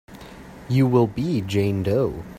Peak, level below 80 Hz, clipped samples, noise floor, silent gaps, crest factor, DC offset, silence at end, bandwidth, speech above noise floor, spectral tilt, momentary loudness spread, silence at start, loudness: -6 dBFS; -48 dBFS; under 0.1%; -41 dBFS; none; 16 dB; under 0.1%; 0 s; 15 kHz; 20 dB; -8 dB/octave; 22 LU; 0.1 s; -21 LUFS